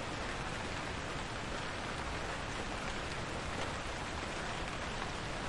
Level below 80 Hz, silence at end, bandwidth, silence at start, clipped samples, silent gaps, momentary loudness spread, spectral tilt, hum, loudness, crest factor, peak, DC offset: -48 dBFS; 0 s; 11.5 kHz; 0 s; under 0.1%; none; 1 LU; -4 dB/octave; none; -40 LUFS; 18 dB; -22 dBFS; under 0.1%